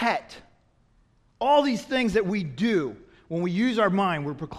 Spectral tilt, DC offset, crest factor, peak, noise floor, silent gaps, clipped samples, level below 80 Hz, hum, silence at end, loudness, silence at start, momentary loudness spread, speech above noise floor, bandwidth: -6 dB/octave; under 0.1%; 18 dB; -8 dBFS; -62 dBFS; none; under 0.1%; -56 dBFS; none; 0 s; -25 LUFS; 0 s; 9 LU; 38 dB; 13 kHz